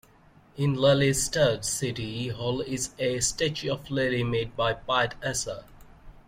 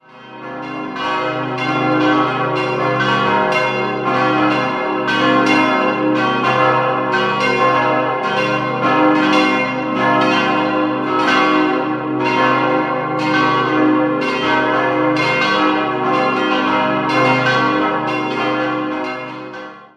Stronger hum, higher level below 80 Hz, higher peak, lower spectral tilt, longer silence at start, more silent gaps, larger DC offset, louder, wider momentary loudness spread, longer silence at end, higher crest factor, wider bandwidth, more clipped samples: neither; first, -50 dBFS vs -56 dBFS; second, -10 dBFS vs -2 dBFS; second, -4 dB/octave vs -5.5 dB/octave; first, 0.55 s vs 0.15 s; neither; neither; second, -27 LUFS vs -15 LUFS; first, 9 LU vs 6 LU; about the same, 0.05 s vs 0.1 s; about the same, 18 dB vs 14 dB; first, 16.5 kHz vs 10 kHz; neither